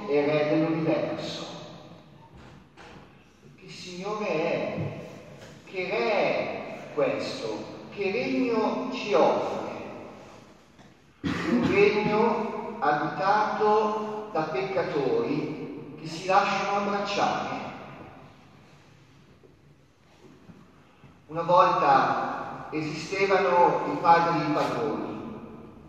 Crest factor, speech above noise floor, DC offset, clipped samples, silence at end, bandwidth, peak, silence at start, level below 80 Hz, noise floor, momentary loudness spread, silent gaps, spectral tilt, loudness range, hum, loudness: 22 dB; 34 dB; under 0.1%; under 0.1%; 0 s; 9 kHz; -6 dBFS; 0 s; -64 dBFS; -58 dBFS; 19 LU; none; -6 dB/octave; 10 LU; none; -26 LUFS